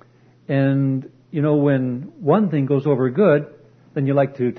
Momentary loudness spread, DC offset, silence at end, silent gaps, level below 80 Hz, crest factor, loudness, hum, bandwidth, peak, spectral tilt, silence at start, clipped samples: 10 LU; under 0.1%; 0 s; none; -64 dBFS; 16 dB; -19 LUFS; none; 4.3 kHz; -4 dBFS; -11 dB/octave; 0.5 s; under 0.1%